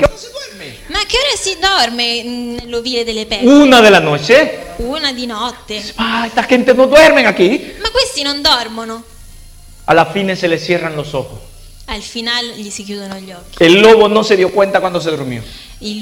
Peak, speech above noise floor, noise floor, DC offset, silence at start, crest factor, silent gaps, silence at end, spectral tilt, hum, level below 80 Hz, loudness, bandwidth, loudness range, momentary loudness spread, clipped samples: 0 dBFS; 24 dB; -36 dBFS; under 0.1%; 0 s; 12 dB; none; 0 s; -4 dB/octave; none; -36 dBFS; -11 LUFS; 17 kHz; 7 LU; 20 LU; under 0.1%